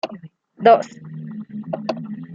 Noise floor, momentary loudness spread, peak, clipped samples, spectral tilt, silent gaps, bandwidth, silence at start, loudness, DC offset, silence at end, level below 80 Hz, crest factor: -40 dBFS; 19 LU; -2 dBFS; under 0.1%; -6.5 dB/octave; none; 7.6 kHz; 0.05 s; -19 LUFS; under 0.1%; 0 s; -70 dBFS; 20 dB